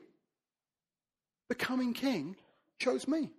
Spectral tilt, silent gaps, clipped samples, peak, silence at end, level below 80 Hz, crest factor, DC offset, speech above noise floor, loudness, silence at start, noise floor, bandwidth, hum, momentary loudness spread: -4.5 dB/octave; none; under 0.1%; -18 dBFS; 0.05 s; -76 dBFS; 20 dB; under 0.1%; over 56 dB; -34 LUFS; 1.5 s; under -90 dBFS; 14 kHz; none; 11 LU